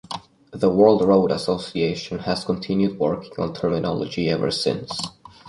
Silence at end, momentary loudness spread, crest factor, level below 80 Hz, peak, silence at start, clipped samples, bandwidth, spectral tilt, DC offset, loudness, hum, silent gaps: 0 s; 13 LU; 20 dB; -52 dBFS; -2 dBFS; 0.1 s; under 0.1%; 11.5 kHz; -6 dB/octave; under 0.1%; -22 LUFS; none; none